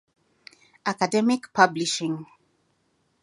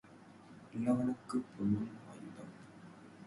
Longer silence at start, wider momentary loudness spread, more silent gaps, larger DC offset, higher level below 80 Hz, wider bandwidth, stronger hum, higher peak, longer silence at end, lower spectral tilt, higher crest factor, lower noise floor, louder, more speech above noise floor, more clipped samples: first, 0.85 s vs 0.05 s; second, 11 LU vs 22 LU; neither; neither; second, -76 dBFS vs -68 dBFS; about the same, 11.5 kHz vs 11.5 kHz; neither; first, -2 dBFS vs -20 dBFS; first, 1 s vs 0 s; second, -4 dB/octave vs -8 dB/octave; first, 26 dB vs 18 dB; first, -70 dBFS vs -58 dBFS; first, -24 LUFS vs -37 LUFS; first, 46 dB vs 22 dB; neither